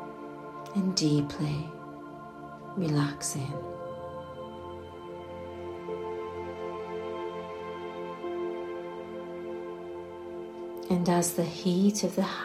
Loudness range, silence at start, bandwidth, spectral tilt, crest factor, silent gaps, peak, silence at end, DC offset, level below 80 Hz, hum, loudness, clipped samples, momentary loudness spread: 8 LU; 0 s; 15 kHz; -5.5 dB/octave; 20 dB; none; -12 dBFS; 0 s; under 0.1%; -64 dBFS; none; -33 LUFS; under 0.1%; 16 LU